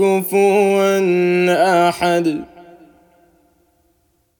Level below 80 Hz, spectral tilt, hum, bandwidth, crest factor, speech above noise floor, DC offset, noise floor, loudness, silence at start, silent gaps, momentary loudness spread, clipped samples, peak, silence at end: -60 dBFS; -5.5 dB/octave; none; 19 kHz; 14 dB; 48 dB; under 0.1%; -62 dBFS; -15 LUFS; 0 s; none; 5 LU; under 0.1%; -2 dBFS; 1.8 s